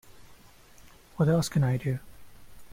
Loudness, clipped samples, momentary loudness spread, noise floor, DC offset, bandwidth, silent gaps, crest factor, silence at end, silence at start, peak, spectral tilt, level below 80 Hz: -27 LUFS; under 0.1%; 12 LU; -53 dBFS; under 0.1%; 16.5 kHz; none; 16 dB; 0 s; 0.15 s; -14 dBFS; -6.5 dB/octave; -54 dBFS